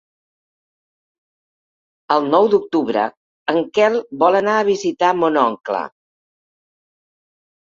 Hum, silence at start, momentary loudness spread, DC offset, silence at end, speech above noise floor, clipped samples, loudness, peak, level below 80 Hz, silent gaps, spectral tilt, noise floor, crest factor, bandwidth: none; 2.1 s; 10 LU; under 0.1%; 1.9 s; over 74 dB; under 0.1%; -17 LUFS; 0 dBFS; -68 dBFS; 3.17-3.46 s; -5 dB/octave; under -90 dBFS; 20 dB; 7.6 kHz